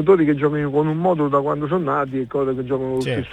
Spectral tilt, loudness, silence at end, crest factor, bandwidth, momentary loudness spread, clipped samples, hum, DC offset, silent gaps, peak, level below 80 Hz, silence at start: -8.5 dB/octave; -20 LUFS; 0 s; 16 dB; 10 kHz; 6 LU; under 0.1%; none; under 0.1%; none; -4 dBFS; -52 dBFS; 0 s